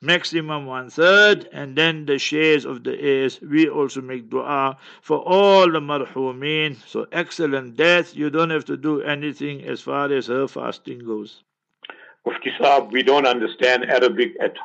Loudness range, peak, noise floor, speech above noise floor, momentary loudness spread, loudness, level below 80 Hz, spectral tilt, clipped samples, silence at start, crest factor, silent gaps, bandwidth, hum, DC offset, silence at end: 7 LU; -2 dBFS; -44 dBFS; 24 dB; 14 LU; -19 LUFS; -74 dBFS; -4.5 dB/octave; under 0.1%; 0 s; 18 dB; none; 8.2 kHz; none; under 0.1%; 0 s